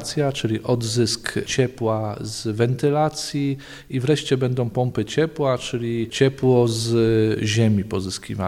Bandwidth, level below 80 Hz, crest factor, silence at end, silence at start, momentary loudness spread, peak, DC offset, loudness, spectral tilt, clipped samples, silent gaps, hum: 15 kHz; -50 dBFS; 16 dB; 0 s; 0 s; 8 LU; -4 dBFS; under 0.1%; -22 LUFS; -5.5 dB/octave; under 0.1%; none; none